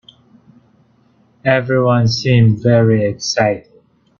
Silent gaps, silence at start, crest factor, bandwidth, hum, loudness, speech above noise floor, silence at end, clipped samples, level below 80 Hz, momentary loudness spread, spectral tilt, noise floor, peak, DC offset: none; 1.45 s; 16 dB; 7.2 kHz; none; -14 LUFS; 41 dB; 0.6 s; under 0.1%; -50 dBFS; 6 LU; -6 dB/octave; -54 dBFS; 0 dBFS; under 0.1%